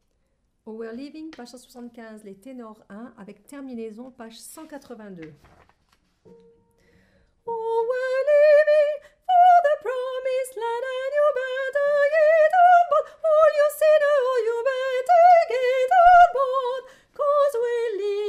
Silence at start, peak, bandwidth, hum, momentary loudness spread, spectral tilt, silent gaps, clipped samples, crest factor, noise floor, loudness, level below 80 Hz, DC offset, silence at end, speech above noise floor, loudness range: 0.65 s; -6 dBFS; 14.5 kHz; none; 25 LU; -3 dB/octave; none; under 0.1%; 16 dB; -69 dBFS; -19 LUFS; -58 dBFS; under 0.1%; 0 s; 30 dB; 22 LU